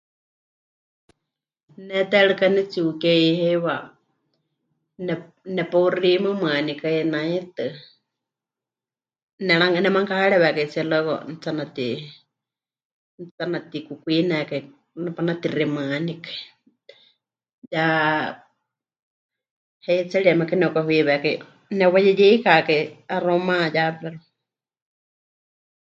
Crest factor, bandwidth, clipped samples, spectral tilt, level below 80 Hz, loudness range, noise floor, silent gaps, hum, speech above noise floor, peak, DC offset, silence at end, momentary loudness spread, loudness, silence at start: 22 dB; 7.6 kHz; under 0.1%; -7 dB/octave; -74 dBFS; 9 LU; under -90 dBFS; 9.23-9.38 s, 12.85-13.18 s, 13.31-13.38 s, 17.53-17.62 s, 18.99-19.29 s, 19.51-19.80 s; none; over 69 dB; 0 dBFS; under 0.1%; 1.75 s; 14 LU; -21 LUFS; 1.8 s